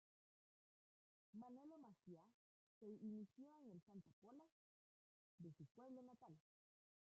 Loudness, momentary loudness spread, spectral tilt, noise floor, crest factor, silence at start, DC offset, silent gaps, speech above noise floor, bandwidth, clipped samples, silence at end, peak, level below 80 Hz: -63 LUFS; 12 LU; -9.5 dB/octave; under -90 dBFS; 18 dB; 1.35 s; under 0.1%; 2.34-2.81 s, 3.82-3.87 s, 4.13-4.22 s, 4.52-5.38 s, 5.71-5.75 s; over 29 dB; 7.2 kHz; under 0.1%; 0.75 s; -46 dBFS; under -90 dBFS